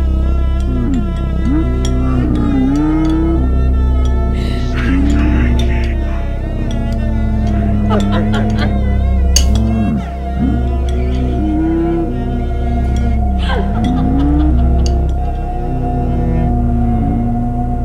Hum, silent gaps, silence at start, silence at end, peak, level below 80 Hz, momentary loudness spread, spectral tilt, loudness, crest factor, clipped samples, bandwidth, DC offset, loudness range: none; none; 0 s; 0 s; 0 dBFS; -16 dBFS; 5 LU; -6.5 dB/octave; -15 LUFS; 12 dB; under 0.1%; 9.2 kHz; under 0.1%; 2 LU